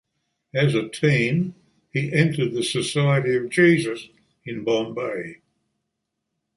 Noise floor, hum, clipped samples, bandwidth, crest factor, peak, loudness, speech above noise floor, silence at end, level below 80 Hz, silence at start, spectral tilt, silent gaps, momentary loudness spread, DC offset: -80 dBFS; none; under 0.1%; 11.5 kHz; 20 dB; -4 dBFS; -22 LUFS; 58 dB; 1.2 s; -62 dBFS; 0.55 s; -6 dB/octave; none; 13 LU; under 0.1%